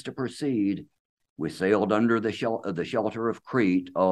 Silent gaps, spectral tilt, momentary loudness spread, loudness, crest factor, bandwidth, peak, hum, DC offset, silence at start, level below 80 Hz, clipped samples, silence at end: 0.99-1.17 s, 1.30-1.36 s; -7 dB/octave; 9 LU; -27 LUFS; 18 dB; 12 kHz; -10 dBFS; none; under 0.1%; 0.05 s; -66 dBFS; under 0.1%; 0 s